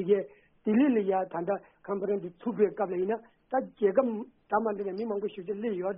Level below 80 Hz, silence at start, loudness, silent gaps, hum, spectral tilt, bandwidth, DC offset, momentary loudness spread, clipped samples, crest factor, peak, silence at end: -72 dBFS; 0 s; -30 LUFS; none; none; -4 dB/octave; 3.8 kHz; under 0.1%; 10 LU; under 0.1%; 18 dB; -12 dBFS; 0 s